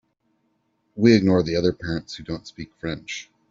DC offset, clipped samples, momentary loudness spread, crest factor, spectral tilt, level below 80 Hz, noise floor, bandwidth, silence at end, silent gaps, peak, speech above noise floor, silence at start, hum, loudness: under 0.1%; under 0.1%; 17 LU; 20 dB; -6.5 dB/octave; -52 dBFS; -70 dBFS; 7.6 kHz; 0.25 s; none; -4 dBFS; 48 dB; 0.95 s; none; -22 LUFS